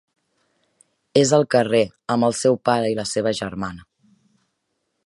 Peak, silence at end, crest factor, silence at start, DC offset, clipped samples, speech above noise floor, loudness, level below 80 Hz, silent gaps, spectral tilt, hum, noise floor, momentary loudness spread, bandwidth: -2 dBFS; 1.25 s; 20 dB; 1.15 s; under 0.1%; under 0.1%; 55 dB; -20 LUFS; -56 dBFS; none; -4.5 dB/octave; none; -74 dBFS; 10 LU; 11.5 kHz